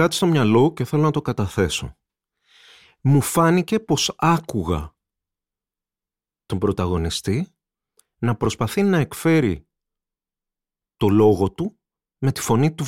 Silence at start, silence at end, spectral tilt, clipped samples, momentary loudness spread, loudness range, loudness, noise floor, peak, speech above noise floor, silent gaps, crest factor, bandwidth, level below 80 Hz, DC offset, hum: 0 s; 0 s; -6 dB/octave; under 0.1%; 10 LU; 5 LU; -20 LUFS; under -90 dBFS; -6 dBFS; over 71 dB; none; 16 dB; 16.5 kHz; -44 dBFS; under 0.1%; none